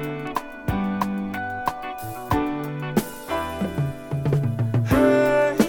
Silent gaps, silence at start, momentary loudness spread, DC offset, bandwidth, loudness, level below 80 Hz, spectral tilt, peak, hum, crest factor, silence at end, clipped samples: none; 0 s; 11 LU; under 0.1%; 19.5 kHz; -24 LUFS; -42 dBFS; -7 dB/octave; -4 dBFS; none; 18 dB; 0 s; under 0.1%